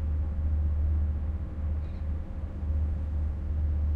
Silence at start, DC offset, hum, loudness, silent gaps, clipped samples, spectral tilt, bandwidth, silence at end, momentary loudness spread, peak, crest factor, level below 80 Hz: 0 s; under 0.1%; none; -32 LUFS; none; under 0.1%; -10.5 dB/octave; 2.6 kHz; 0 s; 6 LU; -20 dBFS; 8 dB; -30 dBFS